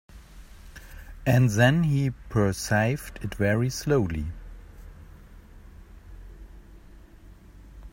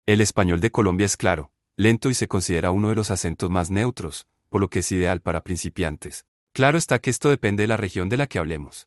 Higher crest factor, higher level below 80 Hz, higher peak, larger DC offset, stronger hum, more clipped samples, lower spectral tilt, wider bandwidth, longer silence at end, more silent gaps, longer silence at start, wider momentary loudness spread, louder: about the same, 22 dB vs 18 dB; about the same, -44 dBFS vs -48 dBFS; about the same, -4 dBFS vs -4 dBFS; neither; neither; neither; about the same, -6 dB/octave vs -5 dB/octave; first, 16.5 kHz vs 12.5 kHz; about the same, 0.05 s vs 0.05 s; second, none vs 6.28-6.47 s; about the same, 0.15 s vs 0.05 s; first, 26 LU vs 10 LU; second, -25 LUFS vs -22 LUFS